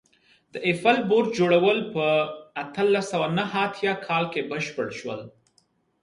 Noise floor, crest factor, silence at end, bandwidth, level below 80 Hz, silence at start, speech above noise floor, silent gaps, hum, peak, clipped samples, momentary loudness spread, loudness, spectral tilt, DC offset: -67 dBFS; 18 dB; 0.75 s; 11.5 kHz; -68 dBFS; 0.55 s; 43 dB; none; none; -6 dBFS; under 0.1%; 13 LU; -24 LUFS; -5.5 dB/octave; under 0.1%